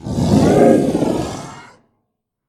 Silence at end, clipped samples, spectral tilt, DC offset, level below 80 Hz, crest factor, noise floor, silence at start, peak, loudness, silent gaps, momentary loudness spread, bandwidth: 0.9 s; under 0.1%; -7 dB/octave; under 0.1%; -38 dBFS; 16 dB; -73 dBFS; 0.05 s; 0 dBFS; -14 LUFS; none; 18 LU; 14.5 kHz